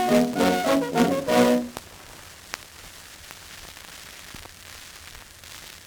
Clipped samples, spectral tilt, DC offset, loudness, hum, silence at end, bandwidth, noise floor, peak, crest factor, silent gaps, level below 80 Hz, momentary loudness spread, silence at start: under 0.1%; -4.5 dB/octave; under 0.1%; -22 LUFS; none; 0.05 s; over 20 kHz; -44 dBFS; -4 dBFS; 22 dB; none; -54 dBFS; 22 LU; 0 s